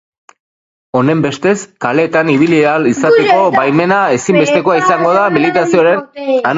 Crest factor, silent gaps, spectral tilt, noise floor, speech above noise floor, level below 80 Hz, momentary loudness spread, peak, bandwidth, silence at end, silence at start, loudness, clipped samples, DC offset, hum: 12 dB; none; -5.5 dB/octave; under -90 dBFS; over 79 dB; -54 dBFS; 5 LU; 0 dBFS; 8 kHz; 0 s; 0.95 s; -11 LUFS; under 0.1%; under 0.1%; none